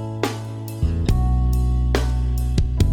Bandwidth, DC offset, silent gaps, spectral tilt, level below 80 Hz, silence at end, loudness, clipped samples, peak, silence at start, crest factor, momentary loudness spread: 17 kHz; under 0.1%; none; -6.5 dB/octave; -22 dBFS; 0 s; -22 LUFS; under 0.1%; -2 dBFS; 0 s; 18 dB; 6 LU